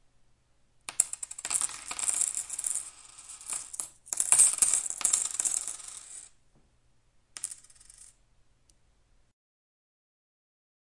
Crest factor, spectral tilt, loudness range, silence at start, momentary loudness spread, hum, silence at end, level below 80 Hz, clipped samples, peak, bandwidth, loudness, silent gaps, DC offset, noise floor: 34 dB; 2 dB/octave; 21 LU; 0.9 s; 24 LU; none; 3.4 s; -68 dBFS; under 0.1%; 0 dBFS; 12 kHz; -27 LUFS; none; under 0.1%; -66 dBFS